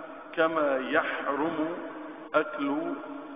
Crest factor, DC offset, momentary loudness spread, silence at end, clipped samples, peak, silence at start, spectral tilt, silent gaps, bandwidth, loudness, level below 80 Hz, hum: 20 dB; under 0.1%; 12 LU; 0 s; under 0.1%; -10 dBFS; 0 s; -9 dB/octave; none; 5 kHz; -29 LUFS; -72 dBFS; none